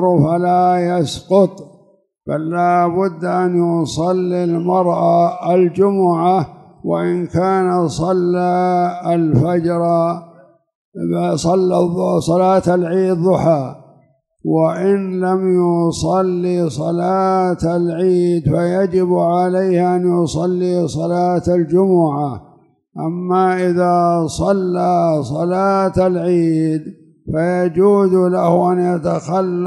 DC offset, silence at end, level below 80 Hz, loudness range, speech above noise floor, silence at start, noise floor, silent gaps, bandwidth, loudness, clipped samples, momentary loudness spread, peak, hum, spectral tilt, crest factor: under 0.1%; 0 s; -46 dBFS; 2 LU; 39 dB; 0 s; -54 dBFS; 10.75-10.92 s; 11.5 kHz; -16 LUFS; under 0.1%; 5 LU; 0 dBFS; none; -7.5 dB/octave; 14 dB